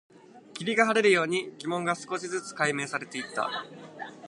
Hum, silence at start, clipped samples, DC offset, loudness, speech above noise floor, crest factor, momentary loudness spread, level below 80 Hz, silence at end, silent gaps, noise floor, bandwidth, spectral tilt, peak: none; 0.35 s; under 0.1%; under 0.1%; -28 LUFS; 19 dB; 22 dB; 17 LU; -80 dBFS; 0 s; none; -48 dBFS; 11.5 kHz; -3.5 dB/octave; -6 dBFS